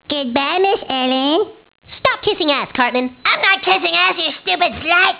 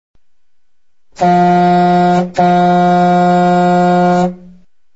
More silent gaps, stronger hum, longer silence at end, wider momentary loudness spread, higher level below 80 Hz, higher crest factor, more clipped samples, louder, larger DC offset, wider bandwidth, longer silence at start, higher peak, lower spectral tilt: neither; neither; second, 0 s vs 0.6 s; first, 6 LU vs 3 LU; about the same, -52 dBFS vs -50 dBFS; about the same, 16 dB vs 12 dB; neither; second, -15 LUFS vs -11 LUFS; second, under 0.1% vs 0.7%; second, 4 kHz vs 8 kHz; second, 0.1 s vs 1.2 s; about the same, 0 dBFS vs 0 dBFS; about the same, -6.5 dB/octave vs -7.5 dB/octave